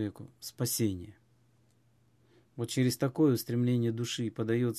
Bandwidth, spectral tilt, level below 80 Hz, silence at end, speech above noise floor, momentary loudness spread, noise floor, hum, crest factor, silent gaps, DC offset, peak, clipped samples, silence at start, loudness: 15 kHz; -5.5 dB/octave; -62 dBFS; 0 s; 37 dB; 17 LU; -68 dBFS; none; 16 dB; none; under 0.1%; -16 dBFS; under 0.1%; 0 s; -31 LUFS